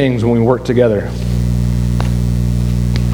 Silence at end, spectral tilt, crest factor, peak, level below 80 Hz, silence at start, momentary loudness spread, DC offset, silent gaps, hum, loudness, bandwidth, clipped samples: 0 s; -8 dB/octave; 14 dB; 0 dBFS; -20 dBFS; 0 s; 4 LU; under 0.1%; none; 60 Hz at -15 dBFS; -15 LUFS; 14.5 kHz; under 0.1%